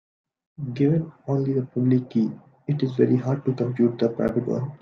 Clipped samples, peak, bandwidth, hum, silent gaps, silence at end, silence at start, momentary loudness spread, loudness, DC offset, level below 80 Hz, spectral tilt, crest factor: under 0.1%; -6 dBFS; 6.6 kHz; none; none; 0.05 s; 0.6 s; 7 LU; -24 LUFS; under 0.1%; -60 dBFS; -10 dB/octave; 18 dB